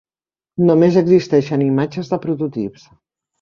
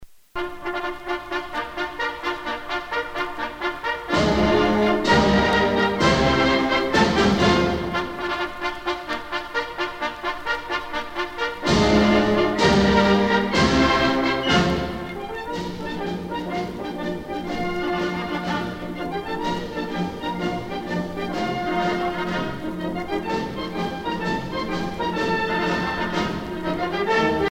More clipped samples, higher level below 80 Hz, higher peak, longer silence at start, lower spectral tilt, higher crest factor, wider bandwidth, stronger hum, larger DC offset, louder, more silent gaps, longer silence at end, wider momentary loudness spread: neither; second, -56 dBFS vs -40 dBFS; first, -2 dBFS vs -6 dBFS; first, 0.6 s vs 0 s; first, -8.5 dB/octave vs -5.5 dB/octave; about the same, 16 dB vs 16 dB; second, 7.2 kHz vs 16.5 kHz; neither; neither; first, -16 LUFS vs -23 LUFS; neither; first, 0.7 s vs 0.05 s; about the same, 13 LU vs 11 LU